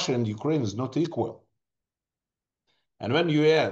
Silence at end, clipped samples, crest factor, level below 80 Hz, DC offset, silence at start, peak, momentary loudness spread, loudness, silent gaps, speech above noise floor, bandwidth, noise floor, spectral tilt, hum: 0 s; under 0.1%; 16 dB; -70 dBFS; under 0.1%; 0 s; -10 dBFS; 11 LU; -26 LUFS; none; over 65 dB; 8 kHz; under -90 dBFS; -6 dB/octave; none